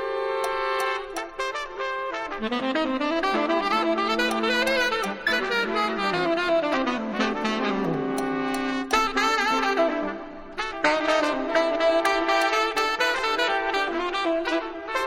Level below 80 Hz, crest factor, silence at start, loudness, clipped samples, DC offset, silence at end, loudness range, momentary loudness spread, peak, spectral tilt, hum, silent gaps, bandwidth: -50 dBFS; 18 dB; 0 s; -24 LUFS; under 0.1%; under 0.1%; 0 s; 3 LU; 8 LU; -6 dBFS; -3.5 dB/octave; none; none; 16 kHz